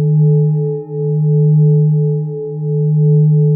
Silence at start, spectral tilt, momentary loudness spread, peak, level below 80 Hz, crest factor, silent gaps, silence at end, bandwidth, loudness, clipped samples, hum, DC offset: 0 s; -18.5 dB/octave; 9 LU; -4 dBFS; -72 dBFS; 8 dB; none; 0 s; 0.9 kHz; -13 LUFS; under 0.1%; none; under 0.1%